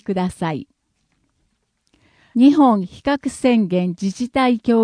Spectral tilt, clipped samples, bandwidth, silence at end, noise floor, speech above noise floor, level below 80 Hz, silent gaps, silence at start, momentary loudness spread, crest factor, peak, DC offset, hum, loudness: -6.5 dB/octave; under 0.1%; 10.5 kHz; 0 s; -68 dBFS; 51 dB; -52 dBFS; none; 0.1 s; 12 LU; 16 dB; -2 dBFS; under 0.1%; none; -18 LUFS